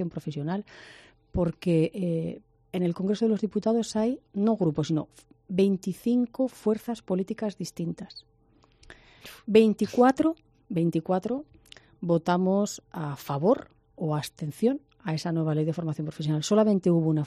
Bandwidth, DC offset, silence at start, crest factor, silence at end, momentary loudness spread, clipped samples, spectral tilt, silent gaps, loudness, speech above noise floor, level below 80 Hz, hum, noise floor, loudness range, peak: 13.5 kHz; under 0.1%; 0 s; 20 dB; 0 s; 13 LU; under 0.1%; -7 dB/octave; none; -27 LUFS; 36 dB; -56 dBFS; none; -62 dBFS; 3 LU; -8 dBFS